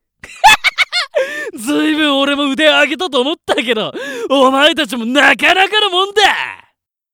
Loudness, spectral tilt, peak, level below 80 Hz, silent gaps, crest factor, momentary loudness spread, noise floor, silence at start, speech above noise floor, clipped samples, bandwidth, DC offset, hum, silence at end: -12 LUFS; -2 dB/octave; 0 dBFS; -48 dBFS; none; 14 dB; 9 LU; -60 dBFS; 0.25 s; 47 dB; under 0.1%; over 20 kHz; under 0.1%; none; 0.6 s